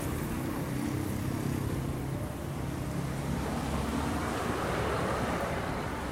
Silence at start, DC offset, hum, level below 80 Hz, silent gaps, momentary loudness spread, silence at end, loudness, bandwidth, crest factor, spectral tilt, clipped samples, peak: 0 s; under 0.1%; none; -44 dBFS; none; 4 LU; 0 s; -33 LUFS; 16 kHz; 14 dB; -6 dB/octave; under 0.1%; -20 dBFS